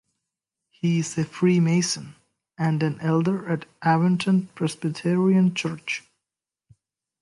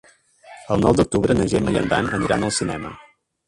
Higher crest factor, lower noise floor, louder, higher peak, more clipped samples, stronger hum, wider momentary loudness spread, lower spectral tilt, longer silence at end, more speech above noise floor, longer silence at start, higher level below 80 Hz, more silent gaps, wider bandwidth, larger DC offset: about the same, 16 dB vs 18 dB; first, -88 dBFS vs -47 dBFS; second, -23 LUFS vs -20 LUFS; second, -8 dBFS vs -4 dBFS; neither; neither; about the same, 9 LU vs 9 LU; about the same, -6 dB/octave vs -5.5 dB/octave; first, 1.25 s vs 0.45 s; first, 65 dB vs 28 dB; first, 0.85 s vs 0.45 s; second, -68 dBFS vs -40 dBFS; neither; about the same, 11.5 kHz vs 11.5 kHz; neither